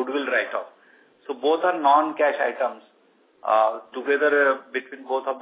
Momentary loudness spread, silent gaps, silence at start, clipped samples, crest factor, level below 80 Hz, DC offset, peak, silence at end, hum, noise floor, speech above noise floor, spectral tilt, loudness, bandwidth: 13 LU; none; 0 s; under 0.1%; 18 dB; under -90 dBFS; under 0.1%; -6 dBFS; 0 s; none; -60 dBFS; 38 dB; -6.5 dB/octave; -23 LUFS; 4 kHz